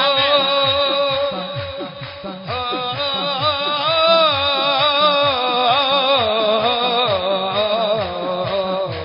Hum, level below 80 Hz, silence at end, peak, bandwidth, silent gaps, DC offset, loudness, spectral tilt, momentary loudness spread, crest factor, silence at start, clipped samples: none; -48 dBFS; 0 s; -4 dBFS; 5.4 kHz; none; under 0.1%; -16 LUFS; -8.5 dB/octave; 12 LU; 14 dB; 0 s; under 0.1%